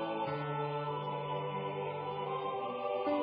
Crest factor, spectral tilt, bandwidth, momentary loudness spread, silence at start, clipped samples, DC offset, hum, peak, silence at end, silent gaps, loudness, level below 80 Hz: 14 dB; -5 dB/octave; 5.2 kHz; 2 LU; 0 s; under 0.1%; under 0.1%; none; -22 dBFS; 0 s; none; -37 LUFS; -74 dBFS